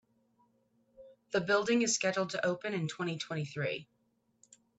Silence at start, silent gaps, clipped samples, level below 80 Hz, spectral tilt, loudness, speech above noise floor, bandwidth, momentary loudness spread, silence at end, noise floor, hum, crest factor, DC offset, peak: 1 s; none; under 0.1%; -76 dBFS; -4 dB/octave; -33 LUFS; 40 dB; 8.8 kHz; 9 LU; 0.95 s; -73 dBFS; none; 18 dB; under 0.1%; -16 dBFS